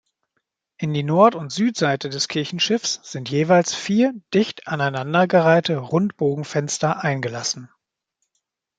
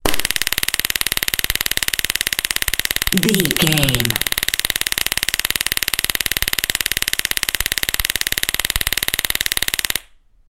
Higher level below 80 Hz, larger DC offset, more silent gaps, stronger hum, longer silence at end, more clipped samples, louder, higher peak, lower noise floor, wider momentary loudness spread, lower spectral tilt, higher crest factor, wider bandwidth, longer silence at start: second, -66 dBFS vs -34 dBFS; second, under 0.1% vs 0.7%; neither; neither; first, 1.15 s vs 0.35 s; neither; second, -20 LUFS vs -17 LUFS; about the same, -2 dBFS vs 0 dBFS; first, -77 dBFS vs -47 dBFS; first, 9 LU vs 3 LU; first, -5 dB/octave vs -1.5 dB/octave; about the same, 20 dB vs 20 dB; second, 9.4 kHz vs over 20 kHz; first, 0.8 s vs 0.05 s